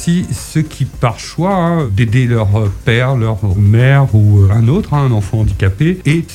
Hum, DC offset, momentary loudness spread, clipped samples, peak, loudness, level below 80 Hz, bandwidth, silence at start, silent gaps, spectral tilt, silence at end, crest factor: none; under 0.1%; 8 LU; under 0.1%; 0 dBFS; -13 LUFS; -30 dBFS; 12.5 kHz; 0 s; none; -7 dB/octave; 0 s; 12 dB